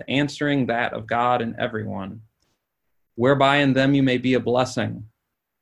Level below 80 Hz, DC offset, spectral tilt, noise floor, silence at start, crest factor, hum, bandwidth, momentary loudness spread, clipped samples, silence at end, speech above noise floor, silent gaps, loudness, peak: -56 dBFS; under 0.1%; -6 dB/octave; -75 dBFS; 0 s; 20 dB; none; 11 kHz; 14 LU; under 0.1%; 0.55 s; 54 dB; none; -21 LUFS; -2 dBFS